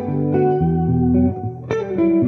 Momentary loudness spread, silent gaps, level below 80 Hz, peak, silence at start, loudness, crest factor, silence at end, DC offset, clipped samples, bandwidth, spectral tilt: 8 LU; none; -36 dBFS; -4 dBFS; 0 s; -18 LUFS; 12 dB; 0 s; under 0.1%; under 0.1%; 6.2 kHz; -10.5 dB/octave